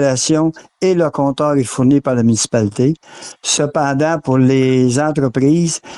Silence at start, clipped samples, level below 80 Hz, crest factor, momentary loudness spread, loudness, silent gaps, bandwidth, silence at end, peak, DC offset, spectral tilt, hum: 0 s; under 0.1%; -50 dBFS; 12 dB; 4 LU; -15 LUFS; none; 12 kHz; 0 s; -4 dBFS; under 0.1%; -5.5 dB/octave; none